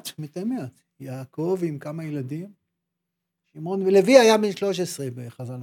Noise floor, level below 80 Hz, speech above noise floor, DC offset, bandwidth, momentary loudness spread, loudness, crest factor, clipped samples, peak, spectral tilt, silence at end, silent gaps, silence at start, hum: -82 dBFS; -78 dBFS; 60 dB; under 0.1%; 17.5 kHz; 22 LU; -22 LUFS; 22 dB; under 0.1%; -2 dBFS; -5 dB/octave; 0 s; none; 0.05 s; none